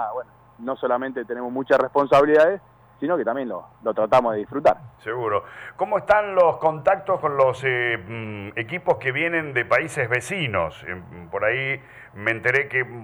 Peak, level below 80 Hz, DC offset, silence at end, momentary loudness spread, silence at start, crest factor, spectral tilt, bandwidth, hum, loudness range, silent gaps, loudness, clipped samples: -6 dBFS; -58 dBFS; under 0.1%; 0 s; 13 LU; 0 s; 16 dB; -5.5 dB/octave; 19.5 kHz; none; 3 LU; none; -22 LUFS; under 0.1%